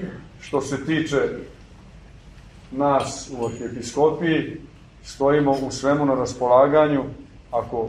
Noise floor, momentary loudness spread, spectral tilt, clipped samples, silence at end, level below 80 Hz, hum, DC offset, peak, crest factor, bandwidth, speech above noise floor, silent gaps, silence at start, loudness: -45 dBFS; 18 LU; -5.5 dB/octave; under 0.1%; 0 s; -48 dBFS; none; under 0.1%; -4 dBFS; 18 dB; 11.5 kHz; 23 dB; none; 0 s; -21 LUFS